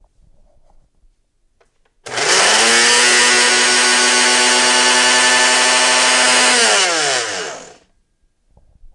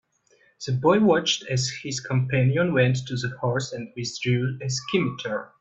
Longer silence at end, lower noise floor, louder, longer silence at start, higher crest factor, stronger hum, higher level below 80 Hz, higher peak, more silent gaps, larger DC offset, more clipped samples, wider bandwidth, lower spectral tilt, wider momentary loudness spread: about the same, 0.1 s vs 0.15 s; about the same, -61 dBFS vs -62 dBFS; first, -10 LUFS vs -24 LUFS; first, 2.05 s vs 0.6 s; about the same, 14 dB vs 18 dB; neither; first, -54 dBFS vs -60 dBFS; first, -2 dBFS vs -6 dBFS; neither; neither; neither; first, 11.5 kHz vs 8 kHz; second, 1 dB/octave vs -5 dB/octave; second, 8 LU vs 11 LU